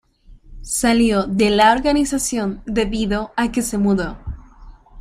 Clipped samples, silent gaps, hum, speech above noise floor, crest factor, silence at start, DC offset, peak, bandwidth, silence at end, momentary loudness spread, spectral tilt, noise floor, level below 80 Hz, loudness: under 0.1%; none; none; 28 dB; 16 dB; 0.3 s; under 0.1%; -2 dBFS; 15.5 kHz; 0 s; 11 LU; -4 dB/octave; -45 dBFS; -36 dBFS; -18 LUFS